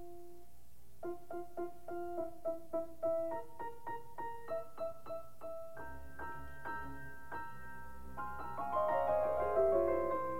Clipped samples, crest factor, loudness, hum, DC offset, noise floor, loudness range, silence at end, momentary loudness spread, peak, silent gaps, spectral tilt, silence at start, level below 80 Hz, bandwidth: under 0.1%; 20 dB; -40 LUFS; none; 0.6%; -64 dBFS; 10 LU; 0 s; 17 LU; -22 dBFS; none; -7 dB/octave; 0 s; -60 dBFS; 16.5 kHz